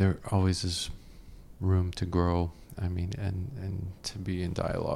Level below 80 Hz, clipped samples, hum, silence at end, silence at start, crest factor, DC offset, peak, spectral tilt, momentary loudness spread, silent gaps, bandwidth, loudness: -48 dBFS; under 0.1%; none; 0 s; 0 s; 16 dB; under 0.1%; -14 dBFS; -6 dB/octave; 9 LU; none; 12.5 kHz; -31 LUFS